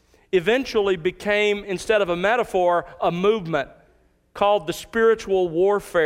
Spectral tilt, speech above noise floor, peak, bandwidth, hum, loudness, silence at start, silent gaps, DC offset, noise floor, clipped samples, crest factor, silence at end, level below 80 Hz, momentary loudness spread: -5 dB/octave; 39 dB; -6 dBFS; 15.5 kHz; none; -21 LUFS; 0.35 s; none; under 0.1%; -59 dBFS; under 0.1%; 16 dB; 0 s; -52 dBFS; 5 LU